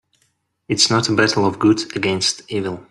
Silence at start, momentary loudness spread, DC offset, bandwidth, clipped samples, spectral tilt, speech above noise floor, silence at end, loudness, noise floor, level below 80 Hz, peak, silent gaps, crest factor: 0.7 s; 10 LU; under 0.1%; 12 kHz; under 0.1%; -3.5 dB/octave; 48 dB; 0.1 s; -17 LUFS; -66 dBFS; -56 dBFS; -2 dBFS; none; 18 dB